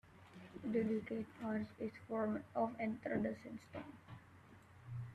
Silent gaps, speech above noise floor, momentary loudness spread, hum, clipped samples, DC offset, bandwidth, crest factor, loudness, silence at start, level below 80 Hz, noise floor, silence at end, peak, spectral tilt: none; 21 dB; 20 LU; none; under 0.1%; under 0.1%; 10 kHz; 18 dB; -43 LUFS; 0.05 s; -74 dBFS; -62 dBFS; 0 s; -26 dBFS; -8.5 dB/octave